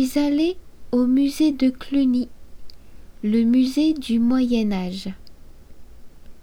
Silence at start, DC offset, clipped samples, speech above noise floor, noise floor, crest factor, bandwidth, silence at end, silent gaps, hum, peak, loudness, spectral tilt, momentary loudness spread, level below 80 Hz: 0 s; under 0.1%; under 0.1%; 21 dB; -40 dBFS; 12 dB; 16.5 kHz; 0 s; none; none; -8 dBFS; -21 LUFS; -6 dB/octave; 11 LU; -44 dBFS